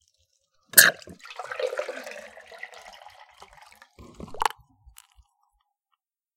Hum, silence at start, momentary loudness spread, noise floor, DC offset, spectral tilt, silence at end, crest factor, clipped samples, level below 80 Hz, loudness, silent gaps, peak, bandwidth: none; 0.75 s; 28 LU; -79 dBFS; under 0.1%; 0.5 dB/octave; 1.9 s; 30 dB; under 0.1%; -60 dBFS; -21 LUFS; none; 0 dBFS; 16.5 kHz